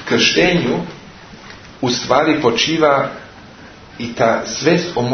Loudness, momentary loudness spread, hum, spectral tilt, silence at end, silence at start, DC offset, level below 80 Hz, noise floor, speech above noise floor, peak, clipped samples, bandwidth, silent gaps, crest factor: -15 LUFS; 21 LU; none; -4 dB/octave; 0 s; 0 s; under 0.1%; -46 dBFS; -39 dBFS; 23 dB; 0 dBFS; under 0.1%; 6.6 kHz; none; 18 dB